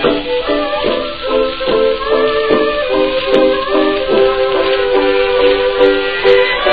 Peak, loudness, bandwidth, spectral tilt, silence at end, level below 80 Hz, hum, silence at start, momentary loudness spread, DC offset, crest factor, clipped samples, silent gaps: 0 dBFS; -13 LUFS; 5 kHz; -6.5 dB/octave; 0 s; -36 dBFS; none; 0 s; 5 LU; 2%; 12 dB; under 0.1%; none